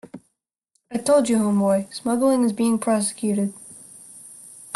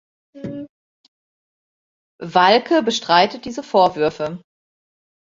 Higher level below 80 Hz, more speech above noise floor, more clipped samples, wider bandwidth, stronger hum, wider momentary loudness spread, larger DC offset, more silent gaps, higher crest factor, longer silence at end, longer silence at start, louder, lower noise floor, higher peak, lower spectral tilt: about the same, -66 dBFS vs -62 dBFS; second, 53 dB vs over 73 dB; neither; first, 12.5 kHz vs 7.6 kHz; neither; about the same, 21 LU vs 21 LU; neither; second, none vs 0.69-2.19 s; about the same, 16 dB vs 20 dB; second, 0 s vs 0.85 s; second, 0.15 s vs 0.35 s; second, -21 LUFS vs -17 LUFS; second, -73 dBFS vs under -90 dBFS; second, -8 dBFS vs 0 dBFS; first, -5.5 dB/octave vs -4 dB/octave